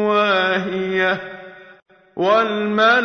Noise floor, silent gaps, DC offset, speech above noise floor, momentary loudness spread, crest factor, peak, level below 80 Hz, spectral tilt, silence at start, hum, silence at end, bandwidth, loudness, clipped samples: -39 dBFS; none; under 0.1%; 22 dB; 17 LU; 16 dB; -4 dBFS; -60 dBFS; -5.5 dB/octave; 0 s; none; 0 s; 6.6 kHz; -18 LUFS; under 0.1%